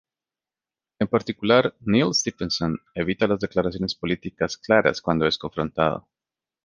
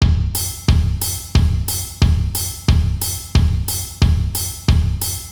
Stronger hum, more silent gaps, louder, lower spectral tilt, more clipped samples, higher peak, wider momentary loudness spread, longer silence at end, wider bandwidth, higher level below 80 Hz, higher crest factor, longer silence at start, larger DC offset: neither; neither; second, -23 LUFS vs -18 LUFS; about the same, -4.5 dB/octave vs -4.5 dB/octave; neither; about the same, -2 dBFS vs 0 dBFS; first, 8 LU vs 4 LU; first, 0.65 s vs 0 s; second, 10 kHz vs over 20 kHz; second, -50 dBFS vs -20 dBFS; first, 22 dB vs 16 dB; first, 1 s vs 0 s; neither